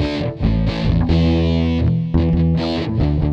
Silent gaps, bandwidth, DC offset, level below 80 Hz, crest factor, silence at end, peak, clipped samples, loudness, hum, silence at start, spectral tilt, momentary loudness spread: none; 6.6 kHz; under 0.1%; -24 dBFS; 12 dB; 0 s; -4 dBFS; under 0.1%; -18 LUFS; none; 0 s; -8.5 dB/octave; 4 LU